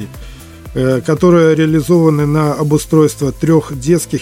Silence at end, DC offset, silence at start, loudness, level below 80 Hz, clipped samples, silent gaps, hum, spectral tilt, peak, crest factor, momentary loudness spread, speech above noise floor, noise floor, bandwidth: 0 s; under 0.1%; 0 s; -12 LUFS; -36 dBFS; under 0.1%; none; none; -7 dB/octave; 0 dBFS; 12 dB; 8 LU; 20 dB; -32 dBFS; 16 kHz